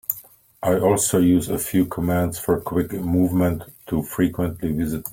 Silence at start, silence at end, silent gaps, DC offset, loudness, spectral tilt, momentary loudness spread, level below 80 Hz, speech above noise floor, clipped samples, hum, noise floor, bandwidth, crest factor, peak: 0.1 s; 0 s; none; under 0.1%; -22 LUFS; -6 dB/octave; 9 LU; -46 dBFS; 25 dB; under 0.1%; none; -46 dBFS; 17 kHz; 18 dB; -4 dBFS